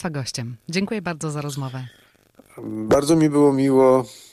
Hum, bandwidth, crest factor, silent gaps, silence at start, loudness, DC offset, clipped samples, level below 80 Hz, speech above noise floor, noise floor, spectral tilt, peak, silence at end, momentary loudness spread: none; 14.5 kHz; 14 dB; none; 0 s; -20 LUFS; under 0.1%; under 0.1%; -54 dBFS; 33 dB; -53 dBFS; -6 dB/octave; -6 dBFS; 0.15 s; 16 LU